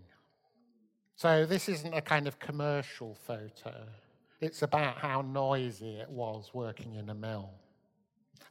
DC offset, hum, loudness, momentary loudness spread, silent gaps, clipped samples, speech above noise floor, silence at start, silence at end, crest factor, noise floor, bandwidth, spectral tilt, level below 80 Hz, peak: under 0.1%; none; -34 LUFS; 16 LU; none; under 0.1%; 40 dB; 0 s; 0 s; 24 dB; -74 dBFS; 16.5 kHz; -5.5 dB/octave; -76 dBFS; -12 dBFS